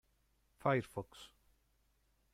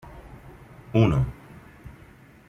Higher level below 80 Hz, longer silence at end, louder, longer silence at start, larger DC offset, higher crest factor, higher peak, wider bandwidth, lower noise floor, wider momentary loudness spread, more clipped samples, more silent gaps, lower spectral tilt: second, -72 dBFS vs -44 dBFS; first, 1.05 s vs 0.6 s; second, -39 LUFS vs -24 LUFS; first, 0.65 s vs 0.05 s; neither; about the same, 22 dB vs 22 dB; second, -20 dBFS vs -6 dBFS; first, 15.5 kHz vs 7.4 kHz; first, -76 dBFS vs -50 dBFS; second, 21 LU vs 26 LU; neither; neither; second, -7 dB/octave vs -8.5 dB/octave